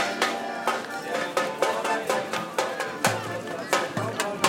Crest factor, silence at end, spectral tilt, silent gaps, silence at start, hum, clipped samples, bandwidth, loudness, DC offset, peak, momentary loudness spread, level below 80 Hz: 20 dB; 0 s; -3 dB/octave; none; 0 s; none; under 0.1%; 17 kHz; -27 LUFS; under 0.1%; -6 dBFS; 5 LU; -72 dBFS